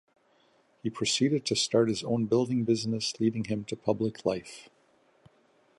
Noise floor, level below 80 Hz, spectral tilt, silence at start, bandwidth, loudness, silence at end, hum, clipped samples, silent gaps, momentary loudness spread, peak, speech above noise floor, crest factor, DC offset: -66 dBFS; -66 dBFS; -4.5 dB/octave; 0.85 s; 11.5 kHz; -29 LUFS; 1.15 s; none; under 0.1%; none; 11 LU; -10 dBFS; 38 dB; 20 dB; under 0.1%